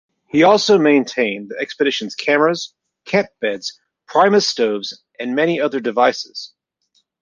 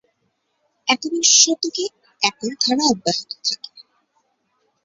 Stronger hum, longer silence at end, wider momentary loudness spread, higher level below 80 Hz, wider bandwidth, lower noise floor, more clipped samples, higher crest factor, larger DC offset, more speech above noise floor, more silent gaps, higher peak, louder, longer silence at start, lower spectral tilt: neither; second, 0.75 s vs 1.05 s; about the same, 16 LU vs 15 LU; about the same, -64 dBFS vs -66 dBFS; first, 9.6 kHz vs 8.2 kHz; second, -65 dBFS vs -70 dBFS; neither; second, 16 dB vs 22 dB; neither; about the same, 48 dB vs 51 dB; neither; about the same, -2 dBFS vs 0 dBFS; about the same, -17 LUFS vs -18 LUFS; second, 0.35 s vs 0.85 s; first, -4 dB/octave vs -0.5 dB/octave